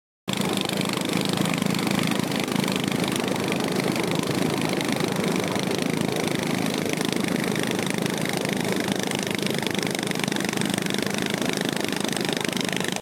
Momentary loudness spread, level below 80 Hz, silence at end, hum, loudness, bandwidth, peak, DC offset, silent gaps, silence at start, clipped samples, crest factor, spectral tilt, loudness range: 2 LU; -62 dBFS; 0 s; none; -25 LUFS; 17 kHz; -6 dBFS; under 0.1%; none; 0.25 s; under 0.1%; 20 dB; -4 dB/octave; 1 LU